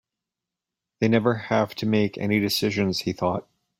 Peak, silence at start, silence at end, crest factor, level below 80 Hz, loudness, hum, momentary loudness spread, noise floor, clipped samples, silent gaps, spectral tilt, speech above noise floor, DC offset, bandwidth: -6 dBFS; 1 s; 0.4 s; 18 dB; -60 dBFS; -24 LUFS; none; 5 LU; -87 dBFS; under 0.1%; none; -5.5 dB/octave; 64 dB; under 0.1%; 16 kHz